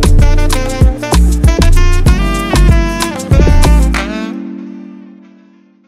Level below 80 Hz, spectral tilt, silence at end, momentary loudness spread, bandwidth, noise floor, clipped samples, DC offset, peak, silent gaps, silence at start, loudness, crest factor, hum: -10 dBFS; -5.5 dB/octave; 0.9 s; 14 LU; 14.5 kHz; -44 dBFS; under 0.1%; under 0.1%; 0 dBFS; none; 0 s; -11 LUFS; 10 dB; none